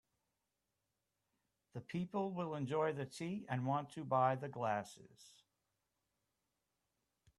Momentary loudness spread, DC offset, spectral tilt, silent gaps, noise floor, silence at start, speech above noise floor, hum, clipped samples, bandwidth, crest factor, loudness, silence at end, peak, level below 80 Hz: 14 LU; under 0.1%; -7 dB/octave; none; -89 dBFS; 1.75 s; 49 dB; none; under 0.1%; 12.5 kHz; 22 dB; -40 LUFS; 2.1 s; -22 dBFS; -82 dBFS